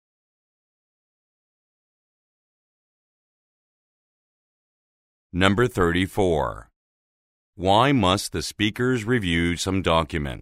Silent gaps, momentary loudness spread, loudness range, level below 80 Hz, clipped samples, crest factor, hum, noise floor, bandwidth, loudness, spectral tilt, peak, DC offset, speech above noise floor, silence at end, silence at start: 6.76-7.53 s; 9 LU; 5 LU; -44 dBFS; under 0.1%; 24 dB; none; under -90 dBFS; 16 kHz; -22 LUFS; -5 dB/octave; 0 dBFS; under 0.1%; over 68 dB; 0.05 s; 5.35 s